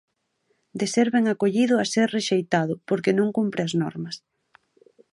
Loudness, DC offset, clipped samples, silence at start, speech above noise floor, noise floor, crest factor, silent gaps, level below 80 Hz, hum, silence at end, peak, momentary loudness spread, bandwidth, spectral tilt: -23 LUFS; under 0.1%; under 0.1%; 0.75 s; 49 dB; -71 dBFS; 18 dB; none; -70 dBFS; none; 0.95 s; -6 dBFS; 10 LU; 11.5 kHz; -5 dB/octave